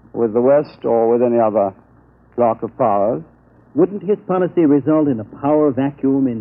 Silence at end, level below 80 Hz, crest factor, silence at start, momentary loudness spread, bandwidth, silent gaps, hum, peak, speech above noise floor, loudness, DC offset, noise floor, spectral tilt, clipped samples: 0 s; -56 dBFS; 14 dB; 0.15 s; 7 LU; 5.4 kHz; none; none; -4 dBFS; 34 dB; -17 LUFS; under 0.1%; -50 dBFS; -12.5 dB/octave; under 0.1%